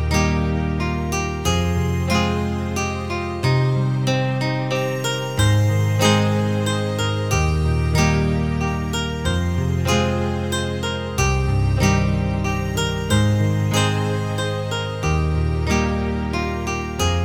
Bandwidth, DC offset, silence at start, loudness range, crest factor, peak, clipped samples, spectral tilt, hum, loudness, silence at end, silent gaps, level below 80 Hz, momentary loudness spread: 18.5 kHz; 0.4%; 0 s; 2 LU; 18 dB; -2 dBFS; under 0.1%; -5.5 dB/octave; none; -20 LUFS; 0 s; none; -32 dBFS; 6 LU